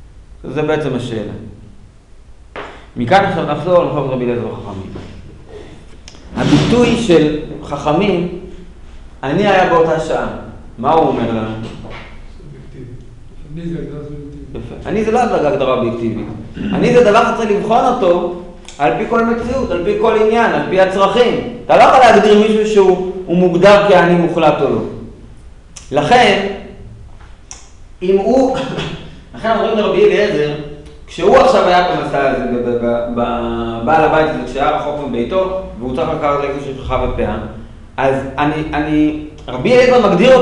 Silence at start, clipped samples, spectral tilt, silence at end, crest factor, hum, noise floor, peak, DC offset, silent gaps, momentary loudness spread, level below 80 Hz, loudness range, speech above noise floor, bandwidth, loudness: 0 s; under 0.1%; -6 dB/octave; 0 s; 14 dB; none; -39 dBFS; 0 dBFS; under 0.1%; none; 20 LU; -34 dBFS; 8 LU; 26 dB; 11 kHz; -13 LUFS